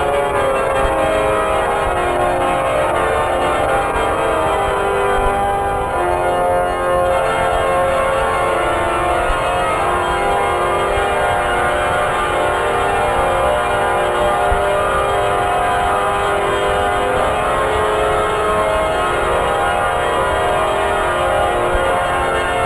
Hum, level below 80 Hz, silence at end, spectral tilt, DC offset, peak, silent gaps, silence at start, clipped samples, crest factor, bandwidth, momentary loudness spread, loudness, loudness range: none; -30 dBFS; 0 s; -4.5 dB/octave; under 0.1%; -4 dBFS; none; 0 s; under 0.1%; 12 dB; 11 kHz; 1 LU; -16 LUFS; 1 LU